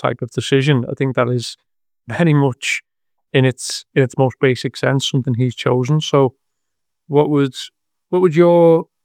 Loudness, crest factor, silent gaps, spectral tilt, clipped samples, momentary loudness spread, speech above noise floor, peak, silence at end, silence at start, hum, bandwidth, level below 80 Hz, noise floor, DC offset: -16 LUFS; 16 dB; none; -6 dB/octave; under 0.1%; 10 LU; 64 dB; 0 dBFS; 0.2 s; 0.05 s; none; 15 kHz; -62 dBFS; -80 dBFS; under 0.1%